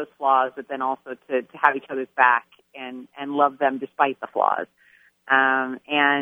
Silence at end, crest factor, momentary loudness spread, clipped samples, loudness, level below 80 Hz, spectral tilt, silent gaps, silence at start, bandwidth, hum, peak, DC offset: 0 s; 24 dB; 16 LU; under 0.1%; -22 LUFS; -80 dBFS; -5.5 dB/octave; none; 0 s; 3.8 kHz; none; 0 dBFS; under 0.1%